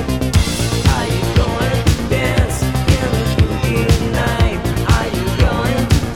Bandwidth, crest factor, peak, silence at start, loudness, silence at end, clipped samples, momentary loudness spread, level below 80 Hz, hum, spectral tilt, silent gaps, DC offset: 18.5 kHz; 12 dB; -2 dBFS; 0 s; -16 LUFS; 0 s; under 0.1%; 2 LU; -22 dBFS; none; -5.5 dB/octave; none; under 0.1%